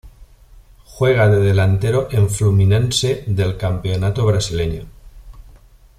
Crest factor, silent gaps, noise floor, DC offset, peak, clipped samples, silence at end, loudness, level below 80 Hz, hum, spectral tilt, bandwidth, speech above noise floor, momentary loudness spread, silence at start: 14 dB; none; -45 dBFS; under 0.1%; -4 dBFS; under 0.1%; 0.55 s; -17 LUFS; -36 dBFS; none; -6 dB/octave; 13.5 kHz; 30 dB; 8 LU; 0.05 s